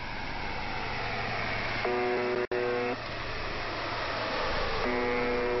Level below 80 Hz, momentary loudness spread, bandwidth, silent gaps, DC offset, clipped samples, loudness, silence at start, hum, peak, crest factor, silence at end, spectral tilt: -44 dBFS; 6 LU; 6 kHz; none; under 0.1%; under 0.1%; -31 LUFS; 0 s; none; -16 dBFS; 14 dB; 0 s; -2.5 dB/octave